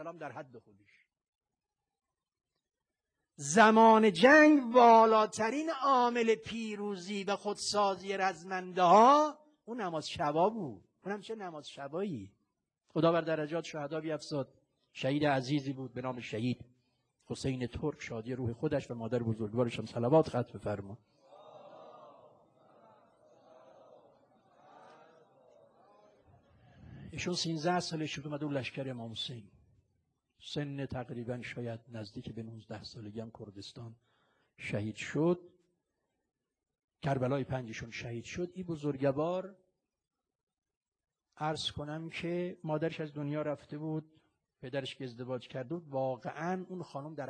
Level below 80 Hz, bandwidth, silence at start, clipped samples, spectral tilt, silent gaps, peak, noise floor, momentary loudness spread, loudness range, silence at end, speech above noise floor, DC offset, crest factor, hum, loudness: -68 dBFS; 11 kHz; 0 s; under 0.1%; -5.5 dB/octave; 1.28-1.33 s, 36.84-36.88 s, 40.35-40.47 s, 40.77-40.81 s, 40.88-40.92 s; -10 dBFS; under -90 dBFS; 21 LU; 17 LU; 0 s; over 58 dB; under 0.1%; 22 dB; none; -32 LUFS